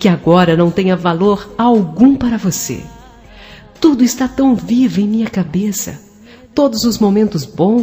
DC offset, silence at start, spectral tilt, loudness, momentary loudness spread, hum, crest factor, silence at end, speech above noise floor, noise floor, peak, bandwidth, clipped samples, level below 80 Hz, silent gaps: under 0.1%; 0 s; -6 dB/octave; -13 LUFS; 8 LU; none; 14 dB; 0 s; 28 dB; -40 dBFS; 0 dBFS; 15.5 kHz; under 0.1%; -42 dBFS; none